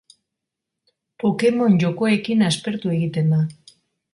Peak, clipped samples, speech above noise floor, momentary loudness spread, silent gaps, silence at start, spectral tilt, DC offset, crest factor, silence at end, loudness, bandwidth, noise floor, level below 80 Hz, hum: -6 dBFS; under 0.1%; 64 dB; 6 LU; none; 1.25 s; -6.5 dB/octave; under 0.1%; 14 dB; 0.6 s; -20 LUFS; 11.5 kHz; -83 dBFS; -62 dBFS; none